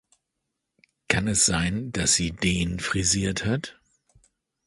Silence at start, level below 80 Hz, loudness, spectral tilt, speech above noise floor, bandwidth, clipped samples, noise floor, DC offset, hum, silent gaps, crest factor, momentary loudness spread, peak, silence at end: 1.1 s; -44 dBFS; -23 LUFS; -3 dB/octave; 57 dB; 11.5 kHz; under 0.1%; -81 dBFS; under 0.1%; none; none; 24 dB; 7 LU; -4 dBFS; 0.95 s